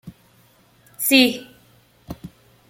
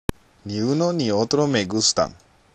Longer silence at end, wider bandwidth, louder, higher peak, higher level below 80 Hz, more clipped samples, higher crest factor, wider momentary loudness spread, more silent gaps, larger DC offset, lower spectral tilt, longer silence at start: about the same, 0.4 s vs 0.4 s; first, 16.5 kHz vs 13 kHz; first, -17 LUFS vs -21 LUFS; about the same, -2 dBFS vs -4 dBFS; second, -56 dBFS vs -44 dBFS; neither; first, 24 dB vs 18 dB; first, 24 LU vs 12 LU; neither; neither; second, -2.5 dB/octave vs -4 dB/octave; second, 0.05 s vs 0.45 s